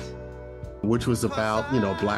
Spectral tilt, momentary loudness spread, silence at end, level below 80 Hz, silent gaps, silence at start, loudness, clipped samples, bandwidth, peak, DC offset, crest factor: -6 dB/octave; 15 LU; 0 s; -44 dBFS; none; 0 s; -25 LUFS; under 0.1%; 13 kHz; -10 dBFS; under 0.1%; 16 dB